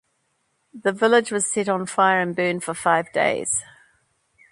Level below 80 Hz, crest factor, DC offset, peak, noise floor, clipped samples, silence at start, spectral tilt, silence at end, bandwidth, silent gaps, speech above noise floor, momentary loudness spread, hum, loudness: -66 dBFS; 18 dB; under 0.1%; -4 dBFS; -70 dBFS; under 0.1%; 0.75 s; -3 dB/octave; 0.9 s; 11.5 kHz; none; 49 dB; 6 LU; none; -21 LUFS